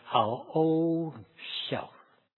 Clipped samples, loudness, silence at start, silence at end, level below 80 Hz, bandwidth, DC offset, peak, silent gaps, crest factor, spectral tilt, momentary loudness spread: under 0.1%; -30 LUFS; 0.05 s; 0.5 s; -76 dBFS; 4.3 kHz; under 0.1%; -10 dBFS; none; 22 dB; -9.5 dB/octave; 14 LU